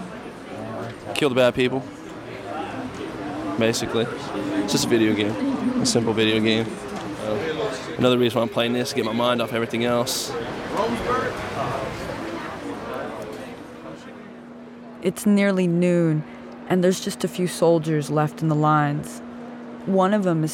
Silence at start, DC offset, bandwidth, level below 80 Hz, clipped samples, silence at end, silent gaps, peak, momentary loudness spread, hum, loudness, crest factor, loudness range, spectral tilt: 0 s; under 0.1%; 17.5 kHz; -52 dBFS; under 0.1%; 0 s; none; -6 dBFS; 17 LU; none; -23 LUFS; 18 dB; 6 LU; -5 dB/octave